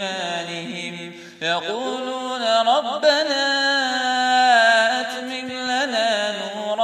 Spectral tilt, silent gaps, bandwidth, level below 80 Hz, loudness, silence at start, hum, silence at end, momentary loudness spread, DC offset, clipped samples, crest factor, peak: -2 dB/octave; none; 14 kHz; -76 dBFS; -20 LUFS; 0 s; none; 0 s; 13 LU; under 0.1%; under 0.1%; 16 dB; -4 dBFS